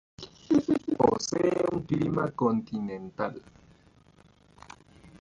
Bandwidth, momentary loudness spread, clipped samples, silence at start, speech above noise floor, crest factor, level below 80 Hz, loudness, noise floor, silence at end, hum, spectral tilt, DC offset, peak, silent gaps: 10.5 kHz; 11 LU; under 0.1%; 0.2 s; 30 dB; 22 dB; -58 dBFS; -28 LUFS; -59 dBFS; 0.05 s; none; -6 dB/octave; under 0.1%; -8 dBFS; none